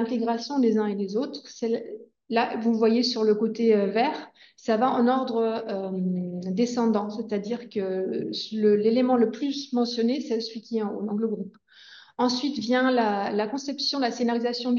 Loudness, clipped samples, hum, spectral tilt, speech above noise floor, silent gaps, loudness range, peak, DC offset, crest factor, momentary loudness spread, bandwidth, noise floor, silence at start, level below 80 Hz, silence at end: -25 LUFS; under 0.1%; none; -5.5 dB/octave; 26 dB; none; 4 LU; -8 dBFS; under 0.1%; 16 dB; 9 LU; 7.4 kHz; -51 dBFS; 0 s; -76 dBFS; 0 s